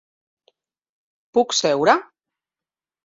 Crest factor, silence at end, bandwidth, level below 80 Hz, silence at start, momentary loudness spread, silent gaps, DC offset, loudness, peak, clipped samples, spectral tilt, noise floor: 22 dB; 1.05 s; 7.8 kHz; -68 dBFS; 1.35 s; 5 LU; none; under 0.1%; -19 LUFS; -2 dBFS; under 0.1%; -2.5 dB/octave; under -90 dBFS